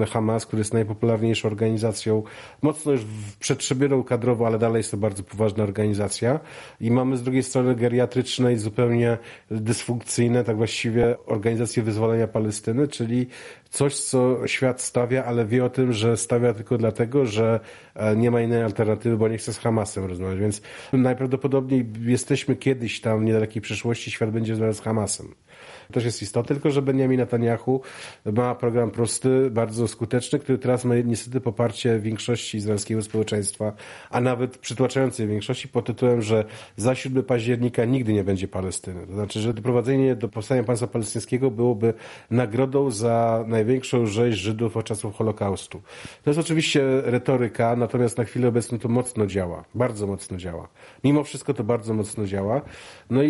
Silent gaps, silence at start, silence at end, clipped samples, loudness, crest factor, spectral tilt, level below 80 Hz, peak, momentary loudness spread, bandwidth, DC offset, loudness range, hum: none; 0 s; 0 s; under 0.1%; -24 LUFS; 16 dB; -6 dB/octave; -58 dBFS; -6 dBFS; 7 LU; 11.5 kHz; under 0.1%; 3 LU; none